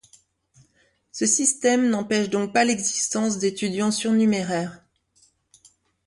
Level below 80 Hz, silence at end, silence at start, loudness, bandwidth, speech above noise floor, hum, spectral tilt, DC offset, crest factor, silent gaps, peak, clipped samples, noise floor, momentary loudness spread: -66 dBFS; 1.3 s; 1.15 s; -22 LUFS; 11.5 kHz; 42 dB; none; -3.5 dB/octave; under 0.1%; 18 dB; none; -6 dBFS; under 0.1%; -64 dBFS; 7 LU